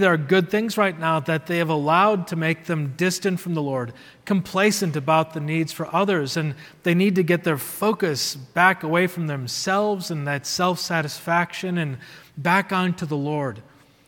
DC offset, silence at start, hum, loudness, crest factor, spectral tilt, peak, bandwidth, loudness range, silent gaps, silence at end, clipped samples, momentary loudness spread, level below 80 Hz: under 0.1%; 0 s; none; -22 LUFS; 20 dB; -5 dB/octave; -2 dBFS; 18 kHz; 2 LU; none; 0.45 s; under 0.1%; 8 LU; -66 dBFS